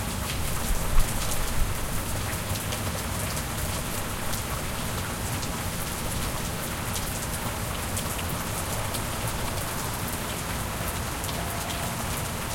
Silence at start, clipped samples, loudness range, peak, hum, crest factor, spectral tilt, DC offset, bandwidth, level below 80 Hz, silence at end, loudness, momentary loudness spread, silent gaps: 0 s; under 0.1%; 1 LU; -8 dBFS; none; 20 dB; -3.5 dB/octave; under 0.1%; 17 kHz; -34 dBFS; 0 s; -29 LUFS; 2 LU; none